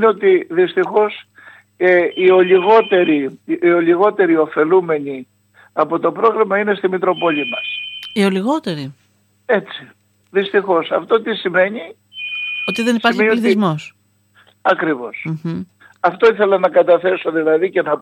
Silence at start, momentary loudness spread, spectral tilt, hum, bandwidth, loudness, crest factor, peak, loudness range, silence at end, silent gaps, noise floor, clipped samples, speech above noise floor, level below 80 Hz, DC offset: 0 s; 13 LU; -6.5 dB/octave; none; 10.5 kHz; -16 LUFS; 16 dB; 0 dBFS; 6 LU; 0 s; none; -54 dBFS; under 0.1%; 39 dB; -68 dBFS; under 0.1%